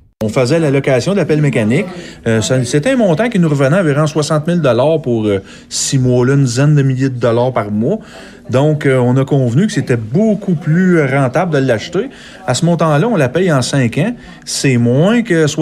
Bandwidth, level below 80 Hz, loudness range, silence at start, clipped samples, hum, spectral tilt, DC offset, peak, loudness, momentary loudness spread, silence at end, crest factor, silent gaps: 13 kHz; -46 dBFS; 1 LU; 0.2 s; under 0.1%; none; -6 dB/octave; under 0.1%; -2 dBFS; -13 LUFS; 7 LU; 0 s; 12 dB; none